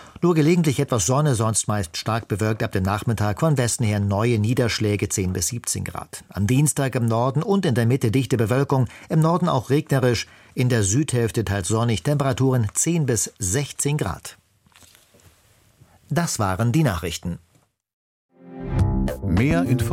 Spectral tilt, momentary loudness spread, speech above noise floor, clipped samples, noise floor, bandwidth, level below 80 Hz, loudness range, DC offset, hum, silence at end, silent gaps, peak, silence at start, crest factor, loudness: -5.5 dB/octave; 7 LU; 36 dB; under 0.1%; -57 dBFS; 16.5 kHz; -40 dBFS; 5 LU; under 0.1%; none; 0 s; 17.93-18.29 s; -6 dBFS; 0 s; 16 dB; -21 LUFS